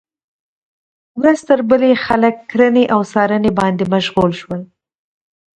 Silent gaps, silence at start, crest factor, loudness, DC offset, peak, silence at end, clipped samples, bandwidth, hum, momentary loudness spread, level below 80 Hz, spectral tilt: none; 1.15 s; 16 dB; -14 LUFS; under 0.1%; 0 dBFS; 0.95 s; under 0.1%; 10.5 kHz; none; 8 LU; -48 dBFS; -6.5 dB/octave